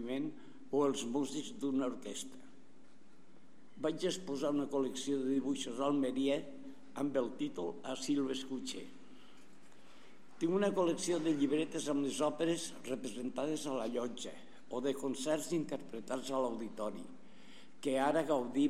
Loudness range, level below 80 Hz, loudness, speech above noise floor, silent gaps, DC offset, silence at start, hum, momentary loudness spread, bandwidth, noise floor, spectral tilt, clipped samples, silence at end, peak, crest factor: 5 LU; -82 dBFS; -37 LUFS; 28 dB; none; 0.4%; 0 s; none; 11 LU; 14.5 kHz; -64 dBFS; -4.5 dB/octave; under 0.1%; 0 s; -18 dBFS; 18 dB